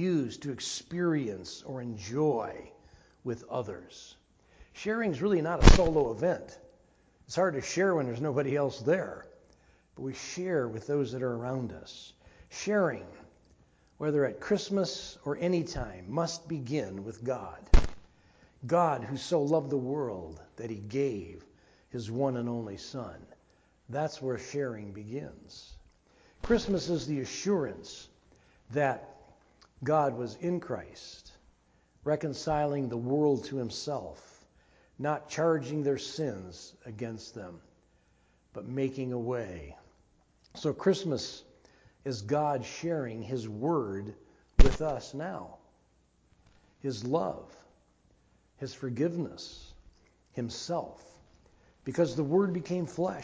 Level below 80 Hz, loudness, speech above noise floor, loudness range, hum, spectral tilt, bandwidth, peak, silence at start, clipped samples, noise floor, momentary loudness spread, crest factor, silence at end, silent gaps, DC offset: -38 dBFS; -32 LUFS; 37 dB; 9 LU; none; -6 dB/octave; 8 kHz; -4 dBFS; 0 s; under 0.1%; -68 dBFS; 18 LU; 28 dB; 0 s; none; under 0.1%